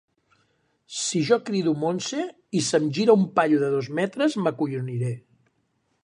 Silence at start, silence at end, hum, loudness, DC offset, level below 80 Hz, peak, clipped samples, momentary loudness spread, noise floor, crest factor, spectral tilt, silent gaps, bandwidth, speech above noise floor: 0.9 s; 0.85 s; none; -24 LUFS; under 0.1%; -72 dBFS; -4 dBFS; under 0.1%; 10 LU; -71 dBFS; 20 dB; -5 dB/octave; none; 11 kHz; 48 dB